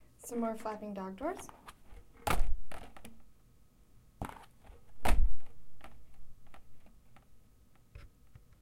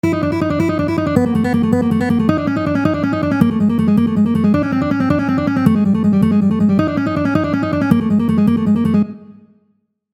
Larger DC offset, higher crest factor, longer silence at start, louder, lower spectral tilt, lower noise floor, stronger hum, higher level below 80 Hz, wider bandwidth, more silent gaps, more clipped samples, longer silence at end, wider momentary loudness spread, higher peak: neither; first, 20 dB vs 14 dB; first, 0.25 s vs 0.05 s; second, -39 LUFS vs -15 LUFS; second, -5 dB/octave vs -8.5 dB/octave; about the same, -64 dBFS vs -63 dBFS; neither; about the same, -40 dBFS vs -44 dBFS; first, 15.5 kHz vs 13 kHz; neither; neither; second, 0.65 s vs 0.8 s; first, 25 LU vs 4 LU; second, -12 dBFS vs 0 dBFS